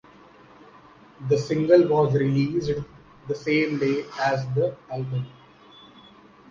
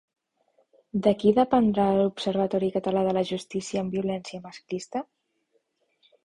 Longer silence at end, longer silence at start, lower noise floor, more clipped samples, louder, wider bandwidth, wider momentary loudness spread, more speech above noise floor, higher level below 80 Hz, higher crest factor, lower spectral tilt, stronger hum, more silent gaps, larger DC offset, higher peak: about the same, 1.2 s vs 1.2 s; first, 1.2 s vs 0.95 s; second, -51 dBFS vs -72 dBFS; neither; first, -23 LUFS vs -26 LUFS; second, 7.4 kHz vs 11 kHz; about the same, 15 LU vs 14 LU; second, 28 dB vs 47 dB; about the same, -56 dBFS vs -60 dBFS; about the same, 20 dB vs 20 dB; about the same, -7.5 dB/octave vs -6.5 dB/octave; neither; neither; neither; first, -4 dBFS vs -8 dBFS